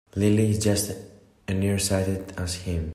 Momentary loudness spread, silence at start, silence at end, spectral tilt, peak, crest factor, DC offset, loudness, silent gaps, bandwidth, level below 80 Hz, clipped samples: 10 LU; 0.15 s; 0 s; -5.5 dB/octave; -10 dBFS; 16 dB; under 0.1%; -25 LUFS; none; 15 kHz; -48 dBFS; under 0.1%